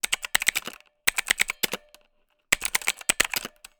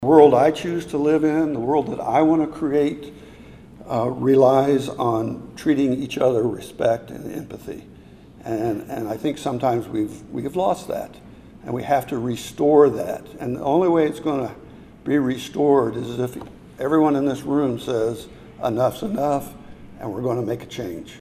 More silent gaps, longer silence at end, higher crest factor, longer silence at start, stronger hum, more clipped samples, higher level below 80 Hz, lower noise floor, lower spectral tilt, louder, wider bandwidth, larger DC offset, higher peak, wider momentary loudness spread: neither; first, 0.3 s vs 0 s; about the same, 24 dB vs 20 dB; about the same, 0.05 s vs 0 s; neither; neither; about the same, -54 dBFS vs -52 dBFS; first, -68 dBFS vs -45 dBFS; second, 1 dB/octave vs -7 dB/octave; second, -25 LUFS vs -21 LUFS; first, over 20 kHz vs 15.5 kHz; neither; second, -4 dBFS vs 0 dBFS; second, 8 LU vs 15 LU